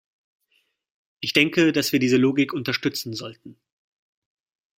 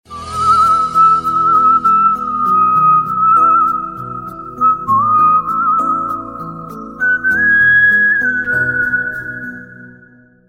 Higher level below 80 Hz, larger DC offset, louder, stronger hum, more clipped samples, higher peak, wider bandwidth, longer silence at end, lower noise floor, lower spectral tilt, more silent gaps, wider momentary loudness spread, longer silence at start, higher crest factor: second, -66 dBFS vs -46 dBFS; neither; second, -21 LUFS vs -11 LUFS; neither; neither; about the same, -2 dBFS vs -2 dBFS; about the same, 16 kHz vs 15 kHz; first, 1.25 s vs 0.6 s; first, -69 dBFS vs -45 dBFS; about the same, -4.5 dB/octave vs -5 dB/octave; neither; second, 13 LU vs 17 LU; first, 1.2 s vs 0.1 s; first, 24 dB vs 10 dB